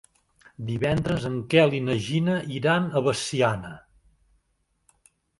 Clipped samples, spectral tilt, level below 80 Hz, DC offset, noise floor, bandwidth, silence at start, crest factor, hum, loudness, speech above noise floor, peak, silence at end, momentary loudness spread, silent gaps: under 0.1%; -5.5 dB/octave; -52 dBFS; under 0.1%; -72 dBFS; 11.5 kHz; 0.6 s; 22 dB; none; -24 LUFS; 48 dB; -4 dBFS; 1.6 s; 11 LU; none